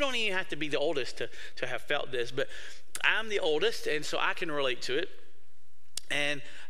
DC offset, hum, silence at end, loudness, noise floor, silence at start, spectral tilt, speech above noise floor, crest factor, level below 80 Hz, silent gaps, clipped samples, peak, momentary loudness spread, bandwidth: 3%; none; 0.05 s; -31 LUFS; -68 dBFS; 0 s; -2.5 dB/octave; 36 dB; 24 dB; -64 dBFS; none; under 0.1%; -10 dBFS; 12 LU; 15.5 kHz